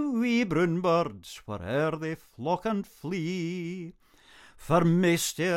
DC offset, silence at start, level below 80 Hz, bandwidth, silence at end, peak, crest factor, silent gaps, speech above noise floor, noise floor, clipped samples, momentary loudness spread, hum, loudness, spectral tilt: under 0.1%; 0 s; -58 dBFS; 16 kHz; 0 s; -10 dBFS; 18 dB; none; 28 dB; -55 dBFS; under 0.1%; 14 LU; none; -28 LUFS; -5.5 dB/octave